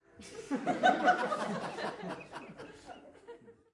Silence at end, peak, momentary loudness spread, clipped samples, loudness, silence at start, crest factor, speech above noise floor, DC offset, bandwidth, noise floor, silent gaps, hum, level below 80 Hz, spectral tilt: 0.2 s; -14 dBFS; 24 LU; under 0.1%; -32 LUFS; 0.2 s; 22 dB; 22 dB; under 0.1%; 11.5 kHz; -54 dBFS; none; none; -74 dBFS; -4.5 dB/octave